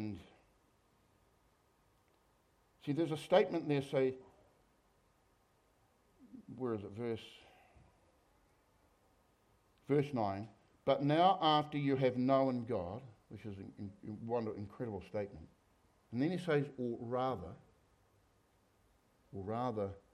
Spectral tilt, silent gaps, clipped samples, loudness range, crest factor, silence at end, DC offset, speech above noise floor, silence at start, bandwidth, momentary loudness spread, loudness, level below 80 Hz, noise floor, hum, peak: -7.5 dB/octave; none; under 0.1%; 13 LU; 24 dB; 0.15 s; under 0.1%; 37 dB; 0 s; 13 kHz; 18 LU; -36 LUFS; -74 dBFS; -73 dBFS; none; -16 dBFS